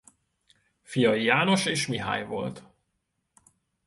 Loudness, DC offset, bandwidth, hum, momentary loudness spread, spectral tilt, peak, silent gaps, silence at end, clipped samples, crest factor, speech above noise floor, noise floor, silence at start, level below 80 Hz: -25 LUFS; under 0.1%; 12 kHz; none; 12 LU; -4.5 dB/octave; -6 dBFS; none; 1.25 s; under 0.1%; 22 dB; 53 dB; -78 dBFS; 0.9 s; -64 dBFS